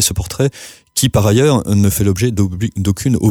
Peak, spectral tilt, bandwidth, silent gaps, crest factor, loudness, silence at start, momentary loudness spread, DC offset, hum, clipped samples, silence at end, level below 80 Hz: -2 dBFS; -5.5 dB/octave; 20 kHz; none; 12 dB; -15 LUFS; 0 s; 7 LU; under 0.1%; none; under 0.1%; 0 s; -34 dBFS